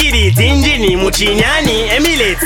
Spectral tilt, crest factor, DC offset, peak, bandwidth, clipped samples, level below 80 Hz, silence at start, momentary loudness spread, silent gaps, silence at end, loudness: -4 dB/octave; 10 dB; under 0.1%; 0 dBFS; 19 kHz; under 0.1%; -20 dBFS; 0 s; 2 LU; none; 0 s; -11 LUFS